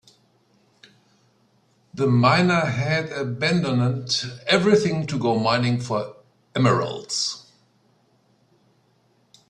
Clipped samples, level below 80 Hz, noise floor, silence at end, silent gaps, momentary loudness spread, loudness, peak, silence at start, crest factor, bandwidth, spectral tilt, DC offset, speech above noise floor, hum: under 0.1%; -60 dBFS; -63 dBFS; 2.1 s; none; 11 LU; -21 LUFS; -4 dBFS; 1.95 s; 20 dB; 10.5 kHz; -5.5 dB/octave; under 0.1%; 42 dB; none